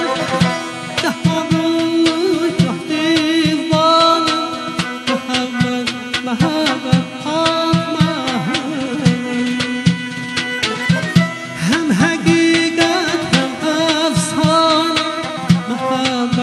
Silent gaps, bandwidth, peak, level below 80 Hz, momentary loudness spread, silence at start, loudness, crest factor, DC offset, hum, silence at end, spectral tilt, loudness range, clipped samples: none; 12.5 kHz; 0 dBFS; -48 dBFS; 8 LU; 0 s; -16 LUFS; 16 dB; under 0.1%; none; 0 s; -5 dB/octave; 3 LU; under 0.1%